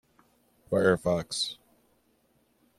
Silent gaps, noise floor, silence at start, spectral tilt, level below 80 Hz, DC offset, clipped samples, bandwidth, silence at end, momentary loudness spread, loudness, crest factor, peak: none; -69 dBFS; 0.7 s; -4.5 dB/octave; -62 dBFS; under 0.1%; under 0.1%; 14.5 kHz; 1.25 s; 8 LU; -28 LUFS; 22 dB; -10 dBFS